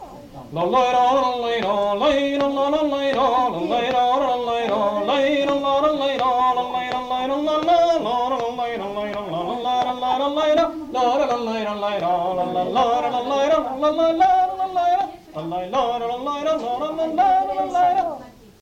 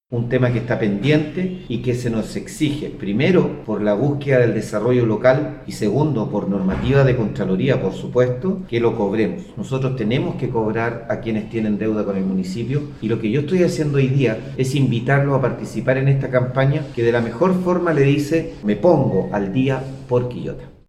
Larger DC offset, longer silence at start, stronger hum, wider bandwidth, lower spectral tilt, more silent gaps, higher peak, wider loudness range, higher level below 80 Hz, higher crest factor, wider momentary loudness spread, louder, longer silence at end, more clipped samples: neither; about the same, 0 s vs 0.1 s; neither; second, 9.4 kHz vs 12 kHz; second, -5 dB/octave vs -7.5 dB/octave; neither; second, -8 dBFS vs 0 dBFS; about the same, 2 LU vs 3 LU; second, -52 dBFS vs -42 dBFS; about the same, 14 dB vs 18 dB; about the same, 8 LU vs 7 LU; about the same, -20 LUFS vs -19 LUFS; first, 0.3 s vs 0.15 s; neither